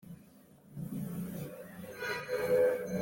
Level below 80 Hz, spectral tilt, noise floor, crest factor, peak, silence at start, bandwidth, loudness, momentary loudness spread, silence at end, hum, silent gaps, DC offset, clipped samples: -68 dBFS; -6 dB/octave; -59 dBFS; 16 dB; -18 dBFS; 0.05 s; 17 kHz; -35 LUFS; 21 LU; 0 s; none; none; under 0.1%; under 0.1%